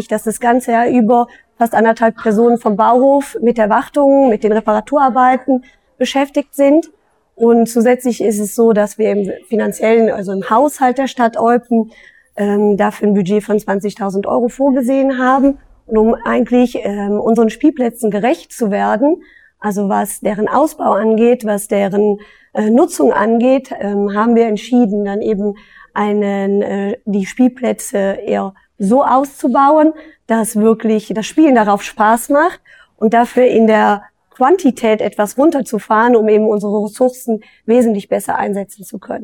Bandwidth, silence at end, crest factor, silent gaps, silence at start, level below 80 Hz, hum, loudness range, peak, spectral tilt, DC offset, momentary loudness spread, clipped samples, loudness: 18 kHz; 0 s; 12 dB; none; 0 s; -50 dBFS; none; 3 LU; -2 dBFS; -6 dB/octave; under 0.1%; 8 LU; under 0.1%; -14 LUFS